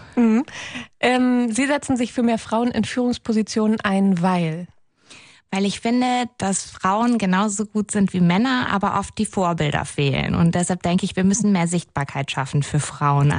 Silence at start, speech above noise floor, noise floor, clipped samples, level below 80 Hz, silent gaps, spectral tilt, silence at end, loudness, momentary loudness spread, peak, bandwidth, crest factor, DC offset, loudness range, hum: 0 s; 28 dB; -48 dBFS; under 0.1%; -48 dBFS; none; -5.5 dB/octave; 0 s; -20 LUFS; 6 LU; -4 dBFS; 10.5 kHz; 16 dB; under 0.1%; 2 LU; none